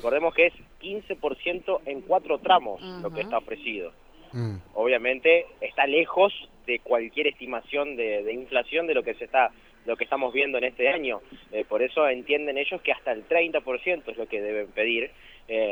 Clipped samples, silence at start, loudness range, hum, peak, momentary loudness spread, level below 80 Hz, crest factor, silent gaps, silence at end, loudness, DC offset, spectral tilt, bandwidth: under 0.1%; 0 s; 3 LU; none; -6 dBFS; 12 LU; -58 dBFS; 20 dB; none; 0 s; -26 LUFS; under 0.1%; -6.5 dB/octave; 19.5 kHz